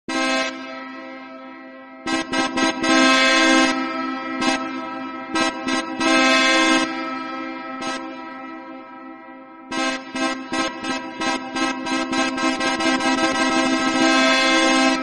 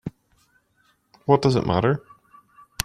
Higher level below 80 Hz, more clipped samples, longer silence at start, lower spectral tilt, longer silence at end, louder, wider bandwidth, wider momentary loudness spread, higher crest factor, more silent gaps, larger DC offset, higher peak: about the same, -56 dBFS vs -54 dBFS; neither; about the same, 0.1 s vs 0.05 s; second, -1.5 dB/octave vs -6 dB/octave; about the same, 0 s vs 0 s; first, -19 LUFS vs -22 LUFS; second, 11 kHz vs 15 kHz; first, 21 LU vs 14 LU; second, 16 dB vs 24 dB; neither; neither; second, -4 dBFS vs 0 dBFS